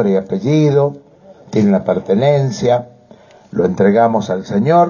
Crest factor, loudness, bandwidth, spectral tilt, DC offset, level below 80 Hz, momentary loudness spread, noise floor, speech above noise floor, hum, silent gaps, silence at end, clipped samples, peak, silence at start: 14 dB; -15 LUFS; 7.2 kHz; -7.5 dB/octave; under 0.1%; -50 dBFS; 6 LU; -43 dBFS; 30 dB; none; none; 0 s; under 0.1%; 0 dBFS; 0 s